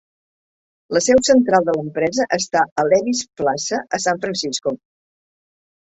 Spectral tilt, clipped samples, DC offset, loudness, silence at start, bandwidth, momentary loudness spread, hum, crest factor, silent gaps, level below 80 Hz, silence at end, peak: -3.5 dB/octave; under 0.1%; under 0.1%; -18 LUFS; 0.9 s; 8.2 kHz; 9 LU; none; 18 dB; 2.72-2.76 s; -54 dBFS; 1.2 s; -2 dBFS